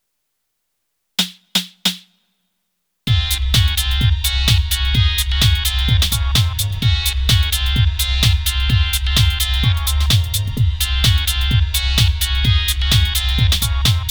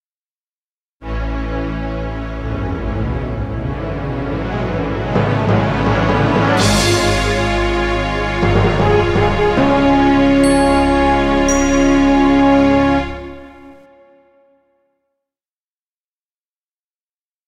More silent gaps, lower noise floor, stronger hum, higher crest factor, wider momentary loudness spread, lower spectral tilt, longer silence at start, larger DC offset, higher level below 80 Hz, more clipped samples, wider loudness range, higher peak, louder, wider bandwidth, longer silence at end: neither; second, -73 dBFS vs under -90 dBFS; neither; about the same, 16 dB vs 14 dB; second, 4 LU vs 11 LU; second, -3 dB/octave vs -5.5 dB/octave; first, 1.2 s vs 1 s; neither; first, -20 dBFS vs -26 dBFS; neither; second, 3 LU vs 10 LU; about the same, -2 dBFS vs -2 dBFS; about the same, -16 LUFS vs -15 LUFS; first, over 20 kHz vs 14.5 kHz; second, 0 s vs 3.75 s